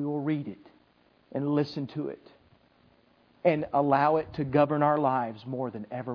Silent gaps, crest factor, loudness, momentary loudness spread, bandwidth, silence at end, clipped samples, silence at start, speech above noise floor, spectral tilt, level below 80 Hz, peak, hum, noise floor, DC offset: none; 20 dB; -28 LUFS; 13 LU; 5.4 kHz; 0 s; under 0.1%; 0 s; 37 dB; -9.5 dB/octave; -64 dBFS; -10 dBFS; none; -64 dBFS; under 0.1%